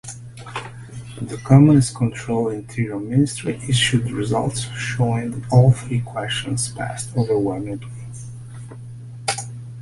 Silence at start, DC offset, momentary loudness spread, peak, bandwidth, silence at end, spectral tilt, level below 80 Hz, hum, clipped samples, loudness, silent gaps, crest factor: 0.05 s; under 0.1%; 21 LU; -2 dBFS; 11.5 kHz; 0 s; -5.5 dB/octave; -46 dBFS; none; under 0.1%; -20 LUFS; none; 18 dB